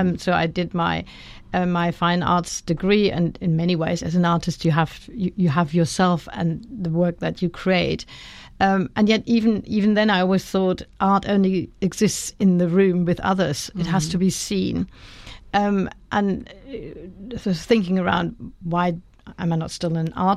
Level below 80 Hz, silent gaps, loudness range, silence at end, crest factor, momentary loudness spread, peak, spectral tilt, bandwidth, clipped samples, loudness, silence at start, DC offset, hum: -46 dBFS; none; 4 LU; 0 s; 16 dB; 11 LU; -6 dBFS; -6 dB/octave; 13.5 kHz; under 0.1%; -21 LUFS; 0 s; under 0.1%; none